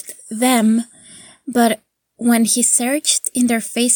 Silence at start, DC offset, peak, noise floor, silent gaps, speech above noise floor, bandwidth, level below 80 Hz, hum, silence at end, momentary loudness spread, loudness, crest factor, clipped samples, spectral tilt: 0.05 s; under 0.1%; -2 dBFS; -43 dBFS; none; 27 dB; 19 kHz; -68 dBFS; none; 0 s; 12 LU; -16 LUFS; 16 dB; under 0.1%; -2.5 dB/octave